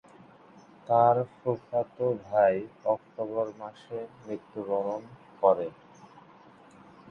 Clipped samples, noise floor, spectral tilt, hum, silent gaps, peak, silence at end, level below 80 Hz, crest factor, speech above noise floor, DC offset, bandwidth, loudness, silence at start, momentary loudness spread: under 0.1%; -54 dBFS; -8.5 dB/octave; none; none; -8 dBFS; 1.4 s; -72 dBFS; 22 dB; 26 dB; under 0.1%; 6.8 kHz; -29 LUFS; 0.9 s; 16 LU